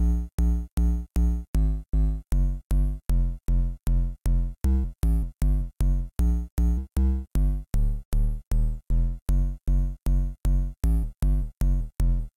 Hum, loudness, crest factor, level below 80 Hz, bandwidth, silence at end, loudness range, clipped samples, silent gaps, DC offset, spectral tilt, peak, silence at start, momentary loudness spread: none; -28 LUFS; 10 dB; -24 dBFS; 13.5 kHz; 0.05 s; 1 LU; under 0.1%; 0.33-0.38 s, 0.72-0.77 s, 1.48-1.54 s, 2.64-2.70 s, 6.51-6.57 s, 8.05-8.12 s, 8.47-8.51 s, 9.22-9.26 s; under 0.1%; -8 dB/octave; -12 dBFS; 0 s; 2 LU